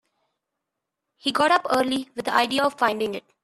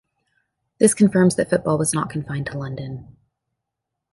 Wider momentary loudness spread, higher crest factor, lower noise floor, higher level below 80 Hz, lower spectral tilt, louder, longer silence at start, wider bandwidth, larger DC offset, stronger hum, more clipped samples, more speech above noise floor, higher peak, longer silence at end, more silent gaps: second, 9 LU vs 15 LU; about the same, 20 dB vs 20 dB; about the same, -83 dBFS vs -82 dBFS; second, -66 dBFS vs -54 dBFS; second, -3 dB/octave vs -5.5 dB/octave; second, -23 LUFS vs -20 LUFS; first, 1.25 s vs 0.8 s; first, 14 kHz vs 12 kHz; neither; neither; neither; about the same, 60 dB vs 62 dB; second, -6 dBFS vs -2 dBFS; second, 0.25 s vs 1.1 s; neither